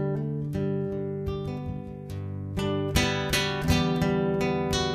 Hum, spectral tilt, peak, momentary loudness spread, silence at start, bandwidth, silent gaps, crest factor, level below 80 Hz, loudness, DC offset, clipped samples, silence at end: none; -5 dB/octave; -10 dBFS; 10 LU; 0 s; 14.5 kHz; none; 18 dB; -40 dBFS; -28 LUFS; under 0.1%; under 0.1%; 0 s